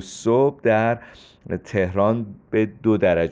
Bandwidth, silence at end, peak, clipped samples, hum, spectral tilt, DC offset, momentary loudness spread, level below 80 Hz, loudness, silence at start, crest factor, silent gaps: 9.4 kHz; 0 s; -6 dBFS; under 0.1%; none; -7 dB/octave; under 0.1%; 9 LU; -52 dBFS; -21 LUFS; 0 s; 14 dB; none